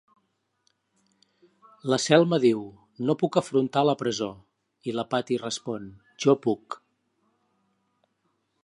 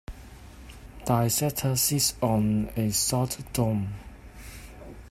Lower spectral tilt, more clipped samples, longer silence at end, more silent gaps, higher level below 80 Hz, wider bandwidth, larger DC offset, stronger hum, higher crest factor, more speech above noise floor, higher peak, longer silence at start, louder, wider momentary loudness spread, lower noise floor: about the same, -5 dB/octave vs -4.5 dB/octave; neither; first, 1.9 s vs 0 s; neither; second, -70 dBFS vs -46 dBFS; second, 11 kHz vs 16 kHz; neither; neither; about the same, 24 dB vs 20 dB; first, 50 dB vs 20 dB; first, -4 dBFS vs -8 dBFS; first, 1.85 s vs 0.1 s; about the same, -25 LUFS vs -26 LUFS; second, 16 LU vs 23 LU; first, -74 dBFS vs -46 dBFS